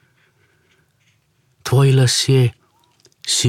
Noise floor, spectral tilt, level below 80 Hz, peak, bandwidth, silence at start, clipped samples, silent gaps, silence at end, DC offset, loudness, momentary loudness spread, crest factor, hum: -61 dBFS; -4.5 dB/octave; -54 dBFS; -4 dBFS; 15 kHz; 1.65 s; under 0.1%; none; 0 s; under 0.1%; -15 LUFS; 14 LU; 16 dB; none